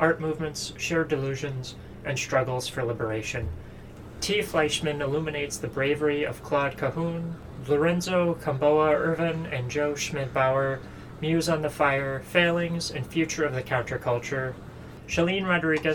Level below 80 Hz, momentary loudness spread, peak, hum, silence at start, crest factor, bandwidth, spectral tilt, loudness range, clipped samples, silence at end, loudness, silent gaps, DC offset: -50 dBFS; 11 LU; -6 dBFS; none; 0 s; 20 dB; 19 kHz; -5 dB/octave; 3 LU; under 0.1%; 0 s; -27 LUFS; none; under 0.1%